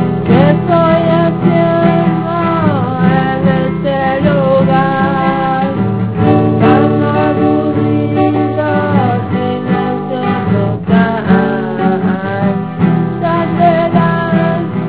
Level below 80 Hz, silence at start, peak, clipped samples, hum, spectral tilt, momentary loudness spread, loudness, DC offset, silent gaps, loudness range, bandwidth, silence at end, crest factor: -38 dBFS; 0 s; 0 dBFS; 0.2%; none; -12 dB/octave; 5 LU; -12 LUFS; 1%; none; 2 LU; 4 kHz; 0 s; 12 dB